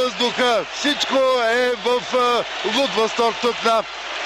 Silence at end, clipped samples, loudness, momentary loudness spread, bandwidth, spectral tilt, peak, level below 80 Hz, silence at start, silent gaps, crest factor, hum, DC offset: 0 s; under 0.1%; -19 LUFS; 4 LU; 15 kHz; -2 dB/octave; -6 dBFS; -56 dBFS; 0 s; none; 14 dB; none; under 0.1%